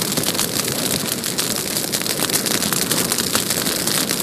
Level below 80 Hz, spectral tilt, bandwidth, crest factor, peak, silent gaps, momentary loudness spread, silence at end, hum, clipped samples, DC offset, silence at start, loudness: -50 dBFS; -2 dB/octave; 15.5 kHz; 20 dB; 0 dBFS; none; 2 LU; 0 s; none; under 0.1%; under 0.1%; 0 s; -18 LUFS